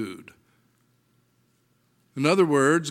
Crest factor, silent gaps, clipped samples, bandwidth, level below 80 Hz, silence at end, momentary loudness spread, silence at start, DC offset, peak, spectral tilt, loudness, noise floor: 22 dB; none; under 0.1%; 14.5 kHz; -78 dBFS; 0 s; 22 LU; 0 s; under 0.1%; -6 dBFS; -5 dB/octave; -22 LUFS; -67 dBFS